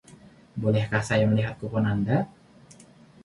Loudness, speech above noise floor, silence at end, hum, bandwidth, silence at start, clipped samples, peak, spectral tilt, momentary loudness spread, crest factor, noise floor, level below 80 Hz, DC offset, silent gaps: -26 LUFS; 28 dB; 0.95 s; none; 11.5 kHz; 0.1 s; under 0.1%; -10 dBFS; -7 dB/octave; 7 LU; 18 dB; -52 dBFS; -54 dBFS; under 0.1%; none